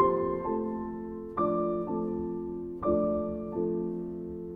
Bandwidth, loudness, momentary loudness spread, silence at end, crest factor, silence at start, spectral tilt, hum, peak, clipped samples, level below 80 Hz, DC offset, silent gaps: 3.8 kHz; -32 LUFS; 9 LU; 0 s; 18 dB; 0 s; -11.5 dB/octave; none; -12 dBFS; under 0.1%; -52 dBFS; under 0.1%; none